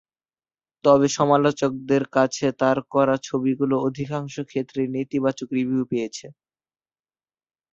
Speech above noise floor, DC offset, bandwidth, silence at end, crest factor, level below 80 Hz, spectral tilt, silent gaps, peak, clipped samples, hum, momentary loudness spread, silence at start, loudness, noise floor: over 68 dB; under 0.1%; 7.8 kHz; 1.4 s; 20 dB; -62 dBFS; -6 dB/octave; none; -4 dBFS; under 0.1%; none; 10 LU; 0.85 s; -22 LUFS; under -90 dBFS